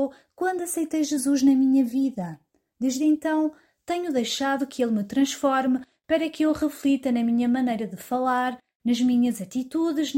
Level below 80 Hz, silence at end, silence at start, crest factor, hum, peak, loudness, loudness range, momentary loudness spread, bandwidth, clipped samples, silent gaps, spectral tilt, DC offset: -64 dBFS; 0 s; 0 s; 14 dB; none; -10 dBFS; -24 LUFS; 2 LU; 9 LU; 16.5 kHz; under 0.1%; 8.75-8.80 s; -4 dB/octave; under 0.1%